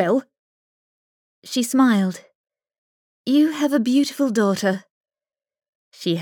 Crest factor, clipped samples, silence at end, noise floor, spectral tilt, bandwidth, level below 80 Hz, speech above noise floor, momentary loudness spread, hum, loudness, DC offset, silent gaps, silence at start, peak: 16 dB; under 0.1%; 0 s; under -90 dBFS; -5 dB/octave; 19 kHz; -82 dBFS; over 71 dB; 11 LU; none; -20 LUFS; under 0.1%; 0.39-1.42 s, 2.35-2.44 s, 2.78-3.24 s, 4.91-5.01 s, 5.69-5.91 s; 0 s; -6 dBFS